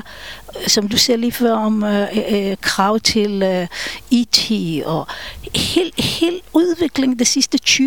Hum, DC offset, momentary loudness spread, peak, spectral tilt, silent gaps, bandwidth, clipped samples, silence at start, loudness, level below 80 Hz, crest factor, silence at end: none; 0.7%; 9 LU; 0 dBFS; -3 dB/octave; none; 19 kHz; under 0.1%; 0.05 s; -16 LUFS; -44 dBFS; 18 dB; 0 s